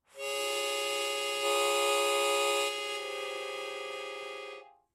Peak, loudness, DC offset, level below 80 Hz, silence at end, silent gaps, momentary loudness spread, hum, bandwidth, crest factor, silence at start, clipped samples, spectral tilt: -16 dBFS; -31 LUFS; under 0.1%; -84 dBFS; 0.25 s; none; 13 LU; none; 16 kHz; 16 dB; 0.15 s; under 0.1%; 1 dB/octave